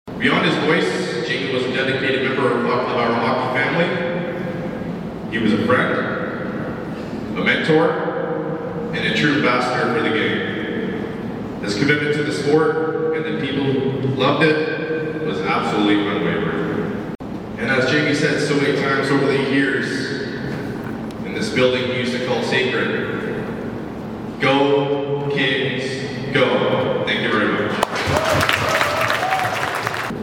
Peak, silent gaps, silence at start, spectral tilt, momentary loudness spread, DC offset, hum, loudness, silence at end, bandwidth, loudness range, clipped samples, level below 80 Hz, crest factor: 0 dBFS; none; 0.05 s; -5.5 dB/octave; 10 LU; under 0.1%; none; -19 LUFS; 0 s; 18 kHz; 2 LU; under 0.1%; -48 dBFS; 18 dB